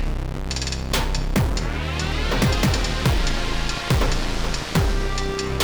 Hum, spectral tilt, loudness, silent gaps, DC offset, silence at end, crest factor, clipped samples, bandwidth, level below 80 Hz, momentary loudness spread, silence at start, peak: none; -4.5 dB/octave; -23 LUFS; none; under 0.1%; 0 s; 12 dB; under 0.1%; over 20 kHz; -24 dBFS; 5 LU; 0 s; -8 dBFS